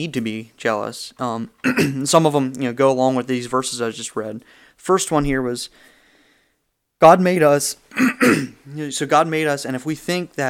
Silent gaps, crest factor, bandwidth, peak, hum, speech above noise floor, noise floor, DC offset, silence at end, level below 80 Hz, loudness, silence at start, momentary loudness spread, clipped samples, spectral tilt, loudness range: none; 20 dB; 16.5 kHz; 0 dBFS; none; 52 dB; -71 dBFS; under 0.1%; 0 s; -46 dBFS; -19 LUFS; 0 s; 14 LU; under 0.1%; -4.5 dB/octave; 6 LU